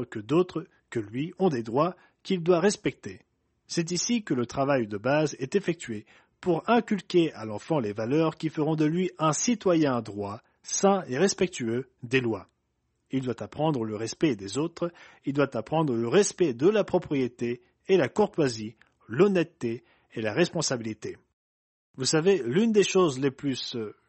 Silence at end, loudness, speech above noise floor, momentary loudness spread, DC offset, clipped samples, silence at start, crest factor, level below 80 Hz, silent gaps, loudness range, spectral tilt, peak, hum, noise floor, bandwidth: 0.15 s; -27 LUFS; 49 dB; 12 LU; under 0.1%; under 0.1%; 0 s; 18 dB; -64 dBFS; 21.33-21.94 s; 3 LU; -5 dB/octave; -8 dBFS; none; -76 dBFS; 8.8 kHz